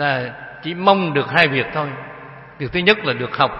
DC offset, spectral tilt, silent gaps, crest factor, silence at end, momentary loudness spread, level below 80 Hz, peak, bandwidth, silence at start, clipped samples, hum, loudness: under 0.1%; -7 dB/octave; none; 20 dB; 0 s; 18 LU; -50 dBFS; 0 dBFS; 11 kHz; 0 s; under 0.1%; none; -18 LUFS